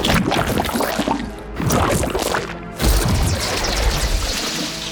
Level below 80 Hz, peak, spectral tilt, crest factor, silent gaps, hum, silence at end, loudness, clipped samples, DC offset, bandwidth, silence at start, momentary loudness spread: -26 dBFS; -6 dBFS; -4 dB/octave; 14 dB; none; none; 0 s; -20 LUFS; under 0.1%; under 0.1%; over 20 kHz; 0 s; 6 LU